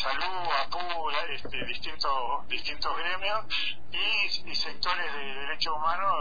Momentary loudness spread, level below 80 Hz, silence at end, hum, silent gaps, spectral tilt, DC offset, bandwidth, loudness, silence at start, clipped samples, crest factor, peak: 7 LU; -54 dBFS; 0 s; none; none; -2.5 dB/octave; 4%; 5 kHz; -30 LUFS; 0 s; under 0.1%; 18 dB; -14 dBFS